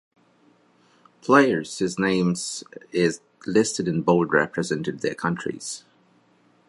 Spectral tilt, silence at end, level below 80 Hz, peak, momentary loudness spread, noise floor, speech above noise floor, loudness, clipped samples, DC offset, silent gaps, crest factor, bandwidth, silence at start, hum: -5 dB/octave; 0.9 s; -62 dBFS; -2 dBFS; 15 LU; -60 dBFS; 38 dB; -23 LUFS; under 0.1%; under 0.1%; none; 22 dB; 11.5 kHz; 1.25 s; none